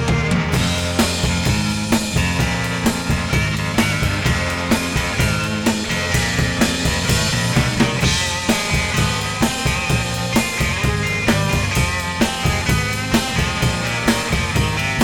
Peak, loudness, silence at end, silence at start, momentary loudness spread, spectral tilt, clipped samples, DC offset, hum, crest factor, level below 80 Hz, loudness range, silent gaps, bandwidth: -2 dBFS; -18 LUFS; 0 s; 0 s; 2 LU; -4 dB/octave; under 0.1%; under 0.1%; none; 16 dB; -28 dBFS; 1 LU; none; 19 kHz